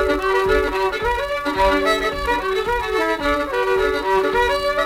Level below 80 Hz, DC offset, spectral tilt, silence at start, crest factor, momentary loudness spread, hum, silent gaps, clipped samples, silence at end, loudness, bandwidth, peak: -34 dBFS; under 0.1%; -4.5 dB/octave; 0 s; 14 dB; 4 LU; none; none; under 0.1%; 0 s; -19 LUFS; 16.5 kHz; -6 dBFS